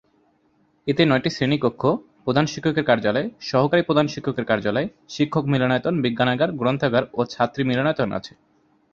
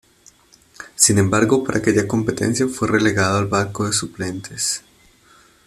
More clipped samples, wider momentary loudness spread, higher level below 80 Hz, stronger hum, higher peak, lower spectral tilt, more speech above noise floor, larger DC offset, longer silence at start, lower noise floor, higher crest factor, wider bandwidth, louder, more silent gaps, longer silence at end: neither; second, 7 LU vs 13 LU; about the same, -56 dBFS vs -52 dBFS; neither; about the same, -2 dBFS vs 0 dBFS; first, -6.5 dB/octave vs -4 dB/octave; first, 42 dB vs 33 dB; neither; about the same, 0.85 s vs 0.8 s; first, -63 dBFS vs -52 dBFS; about the same, 20 dB vs 20 dB; second, 7.6 kHz vs 14 kHz; second, -22 LUFS vs -18 LUFS; neither; second, 0.65 s vs 0.85 s